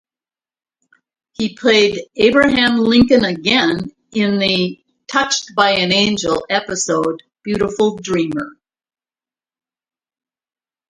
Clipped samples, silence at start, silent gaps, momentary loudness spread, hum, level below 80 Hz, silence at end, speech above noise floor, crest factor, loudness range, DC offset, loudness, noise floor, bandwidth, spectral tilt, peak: under 0.1%; 1.4 s; none; 11 LU; none; -48 dBFS; 2.4 s; over 75 dB; 18 dB; 8 LU; under 0.1%; -15 LUFS; under -90 dBFS; 11 kHz; -4 dB/octave; 0 dBFS